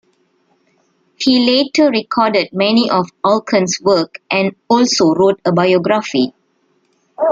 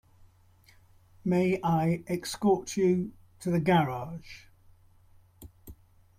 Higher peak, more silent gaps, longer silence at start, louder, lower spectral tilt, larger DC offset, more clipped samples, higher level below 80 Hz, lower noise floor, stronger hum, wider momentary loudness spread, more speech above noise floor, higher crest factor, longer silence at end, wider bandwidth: first, -2 dBFS vs -12 dBFS; neither; about the same, 1.2 s vs 1.25 s; first, -14 LUFS vs -28 LUFS; second, -4.5 dB/octave vs -6.5 dB/octave; neither; neither; about the same, -58 dBFS vs -60 dBFS; about the same, -60 dBFS vs -60 dBFS; neither; second, 6 LU vs 17 LU; first, 47 dB vs 33 dB; about the same, 14 dB vs 18 dB; second, 0 s vs 0.45 s; second, 7.8 kHz vs 15.5 kHz